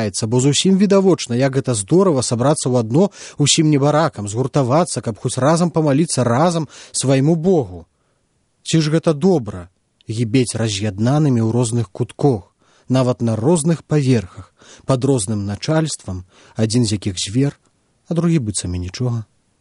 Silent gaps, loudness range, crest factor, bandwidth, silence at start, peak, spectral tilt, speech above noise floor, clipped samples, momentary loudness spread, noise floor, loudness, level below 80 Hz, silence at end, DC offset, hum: none; 5 LU; 18 dB; 11 kHz; 0 s; 0 dBFS; -5.5 dB/octave; 47 dB; under 0.1%; 9 LU; -64 dBFS; -17 LUFS; -54 dBFS; 0.4 s; under 0.1%; none